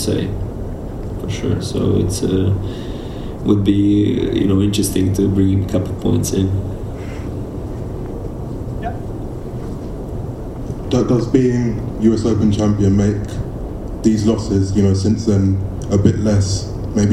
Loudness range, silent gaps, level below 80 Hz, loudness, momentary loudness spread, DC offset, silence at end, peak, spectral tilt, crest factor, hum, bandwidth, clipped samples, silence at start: 9 LU; none; -30 dBFS; -18 LUFS; 13 LU; under 0.1%; 0 s; 0 dBFS; -7 dB/octave; 16 dB; none; 13 kHz; under 0.1%; 0 s